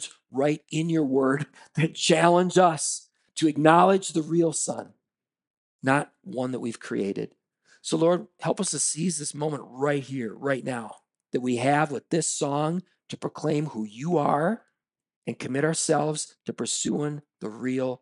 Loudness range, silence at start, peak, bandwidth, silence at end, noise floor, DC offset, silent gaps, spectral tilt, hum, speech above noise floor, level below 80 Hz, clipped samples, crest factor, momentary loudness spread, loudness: 7 LU; 0 s; 0 dBFS; 11.5 kHz; 0.05 s; -87 dBFS; under 0.1%; 5.47-5.79 s, 15.16-15.22 s; -4.5 dB/octave; none; 62 dB; -76 dBFS; under 0.1%; 26 dB; 14 LU; -26 LUFS